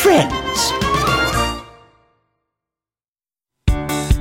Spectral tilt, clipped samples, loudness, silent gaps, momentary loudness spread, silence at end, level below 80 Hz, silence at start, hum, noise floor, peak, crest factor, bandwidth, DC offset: -4 dB/octave; under 0.1%; -18 LUFS; 3.08-3.13 s; 7 LU; 0 s; -28 dBFS; 0 s; none; under -90 dBFS; -2 dBFS; 18 dB; 16.5 kHz; under 0.1%